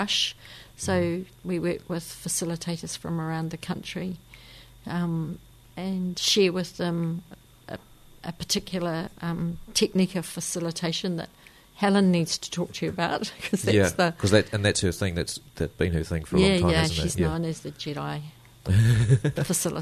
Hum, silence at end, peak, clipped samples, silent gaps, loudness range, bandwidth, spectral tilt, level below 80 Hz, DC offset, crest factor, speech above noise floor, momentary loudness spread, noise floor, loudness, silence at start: none; 0 s; -6 dBFS; under 0.1%; none; 7 LU; 13.5 kHz; -4.5 dB/octave; -46 dBFS; under 0.1%; 20 dB; 23 dB; 15 LU; -49 dBFS; -26 LUFS; 0 s